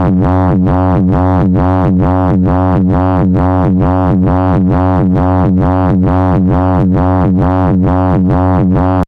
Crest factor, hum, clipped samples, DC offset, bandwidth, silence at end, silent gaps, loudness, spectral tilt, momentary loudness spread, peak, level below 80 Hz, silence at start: 6 dB; none; under 0.1%; under 0.1%; 4.8 kHz; 0 s; none; -10 LUFS; -11 dB/octave; 0 LU; -4 dBFS; -22 dBFS; 0 s